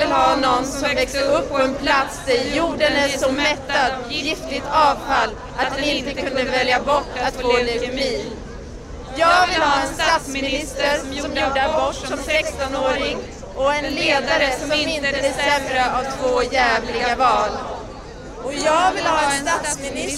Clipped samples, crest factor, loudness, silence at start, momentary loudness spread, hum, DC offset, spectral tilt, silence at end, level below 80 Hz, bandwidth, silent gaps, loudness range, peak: under 0.1%; 14 dB; -19 LUFS; 0 s; 8 LU; none; under 0.1%; -3 dB/octave; 0 s; -38 dBFS; 15.5 kHz; none; 2 LU; -4 dBFS